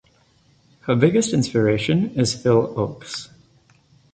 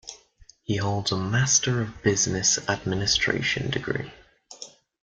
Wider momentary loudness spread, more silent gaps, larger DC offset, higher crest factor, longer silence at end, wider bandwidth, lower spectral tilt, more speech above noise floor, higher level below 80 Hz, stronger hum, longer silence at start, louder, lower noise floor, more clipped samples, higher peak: second, 15 LU vs 21 LU; neither; neither; about the same, 18 dB vs 20 dB; first, 0.9 s vs 0.4 s; about the same, 9.6 kHz vs 10.5 kHz; first, -5.5 dB/octave vs -3 dB/octave; first, 39 dB vs 30 dB; about the same, -52 dBFS vs -50 dBFS; neither; first, 0.85 s vs 0.05 s; first, -20 LUFS vs -24 LUFS; about the same, -58 dBFS vs -55 dBFS; neither; first, -2 dBFS vs -6 dBFS